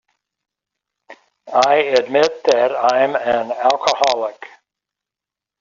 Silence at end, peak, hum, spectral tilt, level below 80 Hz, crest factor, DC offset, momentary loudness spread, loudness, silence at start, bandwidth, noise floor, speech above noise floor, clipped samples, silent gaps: 1.15 s; 0 dBFS; none; -2.5 dB/octave; -64 dBFS; 18 dB; under 0.1%; 5 LU; -16 LUFS; 1.1 s; 7.6 kHz; -87 dBFS; 71 dB; under 0.1%; none